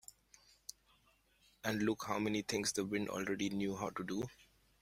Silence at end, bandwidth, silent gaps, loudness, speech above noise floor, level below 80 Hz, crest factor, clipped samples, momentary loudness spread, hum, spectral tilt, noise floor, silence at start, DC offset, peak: 0.4 s; 16 kHz; none; -39 LUFS; 34 dB; -70 dBFS; 20 dB; under 0.1%; 17 LU; none; -4 dB/octave; -72 dBFS; 1.65 s; under 0.1%; -20 dBFS